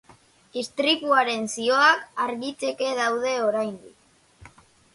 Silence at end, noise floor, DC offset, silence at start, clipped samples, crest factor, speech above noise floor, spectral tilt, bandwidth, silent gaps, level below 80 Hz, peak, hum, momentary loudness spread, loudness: 0.45 s; -55 dBFS; under 0.1%; 0.55 s; under 0.1%; 20 dB; 32 dB; -2 dB/octave; 11.5 kHz; none; -68 dBFS; -4 dBFS; none; 13 LU; -23 LUFS